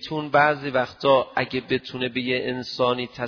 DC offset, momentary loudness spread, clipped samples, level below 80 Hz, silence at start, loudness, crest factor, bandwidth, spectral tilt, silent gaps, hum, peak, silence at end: under 0.1%; 7 LU; under 0.1%; -58 dBFS; 0 s; -23 LUFS; 18 dB; 5.4 kHz; -6 dB/octave; none; none; -4 dBFS; 0 s